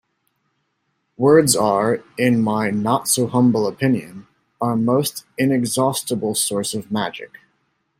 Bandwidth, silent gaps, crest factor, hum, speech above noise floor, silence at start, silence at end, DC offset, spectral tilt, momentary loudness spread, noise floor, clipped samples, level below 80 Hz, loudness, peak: 16 kHz; none; 18 dB; none; 52 dB; 1.2 s; 0.75 s; under 0.1%; -4.5 dB/octave; 10 LU; -71 dBFS; under 0.1%; -60 dBFS; -19 LUFS; -2 dBFS